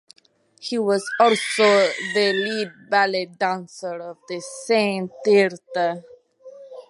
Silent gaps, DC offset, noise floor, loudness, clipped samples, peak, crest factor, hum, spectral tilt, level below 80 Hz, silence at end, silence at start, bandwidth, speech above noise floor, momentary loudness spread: none; under 0.1%; -45 dBFS; -21 LUFS; under 0.1%; -4 dBFS; 18 dB; none; -3.5 dB/octave; -78 dBFS; 0.1 s; 0.6 s; 11.5 kHz; 24 dB; 15 LU